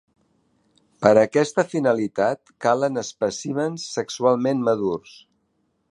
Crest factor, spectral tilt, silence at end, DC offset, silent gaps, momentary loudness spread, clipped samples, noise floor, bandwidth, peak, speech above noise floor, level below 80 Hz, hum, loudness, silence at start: 22 dB; -5 dB/octave; 0.9 s; under 0.1%; none; 9 LU; under 0.1%; -70 dBFS; 11.5 kHz; -2 dBFS; 49 dB; -66 dBFS; none; -22 LUFS; 1 s